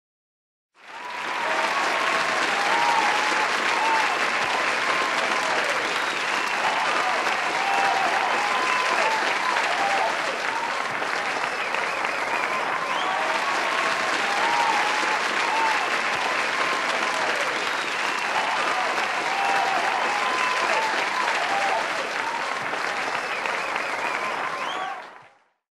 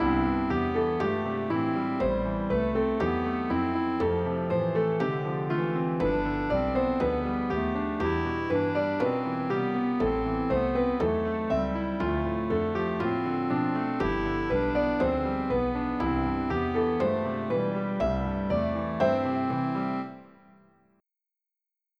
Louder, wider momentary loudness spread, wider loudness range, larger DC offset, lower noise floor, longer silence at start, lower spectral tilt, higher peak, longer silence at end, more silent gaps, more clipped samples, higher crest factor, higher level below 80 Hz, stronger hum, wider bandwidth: first, -23 LUFS vs -28 LUFS; about the same, 5 LU vs 3 LU; about the same, 3 LU vs 1 LU; neither; second, -54 dBFS vs -88 dBFS; first, 0.85 s vs 0 s; second, -1 dB/octave vs -9 dB/octave; first, -8 dBFS vs -12 dBFS; second, 0.45 s vs 1.75 s; neither; neither; about the same, 16 dB vs 16 dB; second, -72 dBFS vs -42 dBFS; neither; first, 14 kHz vs 6.6 kHz